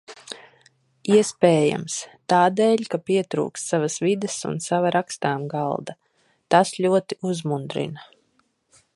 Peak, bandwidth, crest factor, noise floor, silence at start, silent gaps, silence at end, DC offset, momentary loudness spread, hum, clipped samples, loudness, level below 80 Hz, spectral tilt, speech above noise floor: -2 dBFS; 11.5 kHz; 20 dB; -67 dBFS; 0.1 s; none; 0.9 s; under 0.1%; 14 LU; none; under 0.1%; -22 LUFS; -68 dBFS; -5 dB/octave; 45 dB